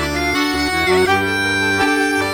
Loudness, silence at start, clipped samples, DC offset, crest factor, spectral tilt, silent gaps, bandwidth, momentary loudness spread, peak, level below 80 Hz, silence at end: -16 LUFS; 0 s; under 0.1%; under 0.1%; 14 dB; -4 dB/octave; none; 19 kHz; 3 LU; -2 dBFS; -36 dBFS; 0 s